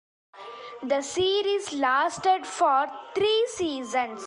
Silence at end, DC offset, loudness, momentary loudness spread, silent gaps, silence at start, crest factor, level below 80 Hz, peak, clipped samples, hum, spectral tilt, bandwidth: 0 s; under 0.1%; -25 LUFS; 15 LU; none; 0.35 s; 14 dB; -64 dBFS; -12 dBFS; under 0.1%; none; -2.5 dB/octave; 11.5 kHz